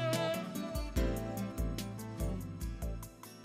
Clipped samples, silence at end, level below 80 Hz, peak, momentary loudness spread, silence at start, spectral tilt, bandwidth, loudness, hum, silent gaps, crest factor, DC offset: under 0.1%; 0 s; -42 dBFS; -20 dBFS; 8 LU; 0 s; -5.5 dB/octave; 16 kHz; -39 LUFS; none; none; 18 dB; under 0.1%